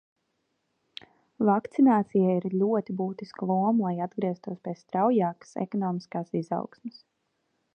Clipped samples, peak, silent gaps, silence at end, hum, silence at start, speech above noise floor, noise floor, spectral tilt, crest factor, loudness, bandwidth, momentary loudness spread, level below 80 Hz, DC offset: under 0.1%; -10 dBFS; none; 0.85 s; none; 1.4 s; 50 dB; -77 dBFS; -9 dB/octave; 18 dB; -27 LUFS; 8.4 kHz; 17 LU; -78 dBFS; under 0.1%